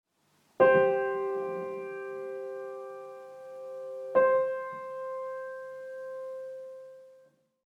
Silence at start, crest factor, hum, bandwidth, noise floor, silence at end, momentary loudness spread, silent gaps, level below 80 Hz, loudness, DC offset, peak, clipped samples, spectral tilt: 0.6 s; 22 dB; none; 4.5 kHz; -69 dBFS; 0.5 s; 20 LU; none; -82 dBFS; -30 LUFS; under 0.1%; -10 dBFS; under 0.1%; -7 dB/octave